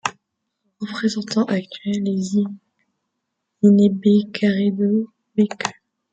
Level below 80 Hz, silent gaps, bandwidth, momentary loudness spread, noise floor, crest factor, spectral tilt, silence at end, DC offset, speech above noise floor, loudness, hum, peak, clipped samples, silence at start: -66 dBFS; none; 8 kHz; 13 LU; -77 dBFS; 18 dB; -6.5 dB/octave; 0.4 s; under 0.1%; 59 dB; -20 LUFS; none; -2 dBFS; under 0.1%; 0.05 s